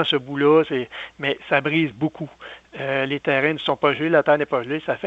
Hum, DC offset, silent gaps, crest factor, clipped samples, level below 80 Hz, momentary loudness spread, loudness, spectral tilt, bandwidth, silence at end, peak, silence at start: none; under 0.1%; none; 18 dB; under 0.1%; -62 dBFS; 14 LU; -21 LUFS; -7 dB/octave; 7.8 kHz; 0 s; -4 dBFS; 0 s